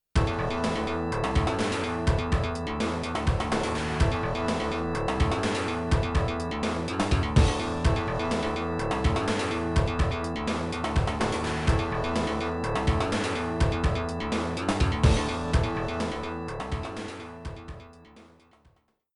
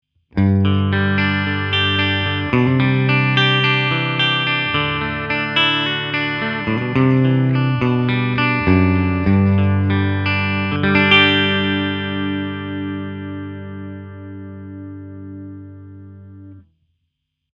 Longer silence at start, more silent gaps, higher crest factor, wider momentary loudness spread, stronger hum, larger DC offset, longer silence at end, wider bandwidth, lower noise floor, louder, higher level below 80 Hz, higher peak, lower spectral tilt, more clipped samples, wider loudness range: second, 0.15 s vs 0.35 s; neither; about the same, 20 dB vs 18 dB; second, 5 LU vs 19 LU; second, none vs 50 Hz at -55 dBFS; neither; about the same, 0.9 s vs 0.95 s; first, 11.5 kHz vs 6.6 kHz; second, -64 dBFS vs -74 dBFS; second, -28 LUFS vs -16 LUFS; first, -34 dBFS vs -48 dBFS; second, -8 dBFS vs 0 dBFS; second, -6 dB/octave vs -7.5 dB/octave; neither; second, 2 LU vs 17 LU